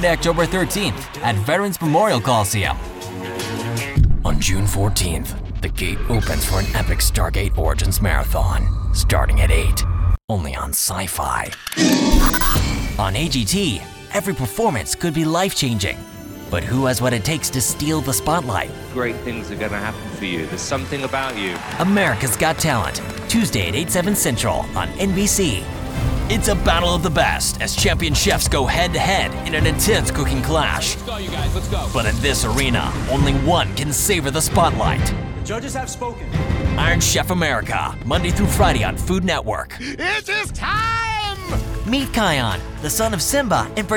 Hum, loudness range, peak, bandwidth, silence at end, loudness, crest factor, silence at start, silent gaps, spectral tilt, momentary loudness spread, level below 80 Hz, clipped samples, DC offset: none; 3 LU; -2 dBFS; 19.5 kHz; 0 s; -19 LUFS; 18 dB; 0 s; 10.24-10.28 s; -4 dB/octave; 8 LU; -26 dBFS; under 0.1%; under 0.1%